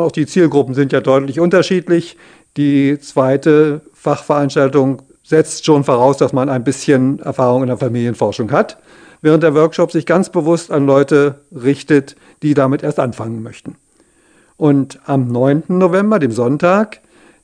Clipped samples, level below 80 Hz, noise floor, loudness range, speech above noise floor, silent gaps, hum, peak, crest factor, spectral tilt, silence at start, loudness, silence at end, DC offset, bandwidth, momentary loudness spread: 0.1%; -58 dBFS; -53 dBFS; 4 LU; 39 dB; none; none; 0 dBFS; 14 dB; -7 dB/octave; 0 s; -14 LUFS; 0.6 s; under 0.1%; 10 kHz; 7 LU